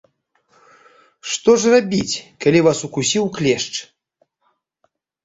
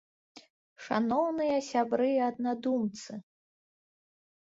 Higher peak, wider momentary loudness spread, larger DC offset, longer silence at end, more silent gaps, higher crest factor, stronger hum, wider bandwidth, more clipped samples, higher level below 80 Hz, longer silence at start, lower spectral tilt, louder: first, -2 dBFS vs -14 dBFS; second, 12 LU vs 16 LU; neither; about the same, 1.4 s vs 1.3 s; second, none vs 0.50-0.76 s; about the same, 18 dB vs 18 dB; neither; about the same, 8 kHz vs 8 kHz; neither; first, -56 dBFS vs -74 dBFS; first, 1.25 s vs 0.35 s; second, -4 dB/octave vs -5.5 dB/octave; first, -17 LUFS vs -30 LUFS